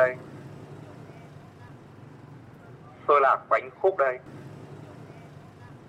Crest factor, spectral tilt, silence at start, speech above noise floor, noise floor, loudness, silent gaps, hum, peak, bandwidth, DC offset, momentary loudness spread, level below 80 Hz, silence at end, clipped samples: 20 dB; -7 dB/octave; 0 s; 22 dB; -47 dBFS; -24 LUFS; none; none; -8 dBFS; 10.5 kHz; under 0.1%; 26 LU; -68 dBFS; 0.15 s; under 0.1%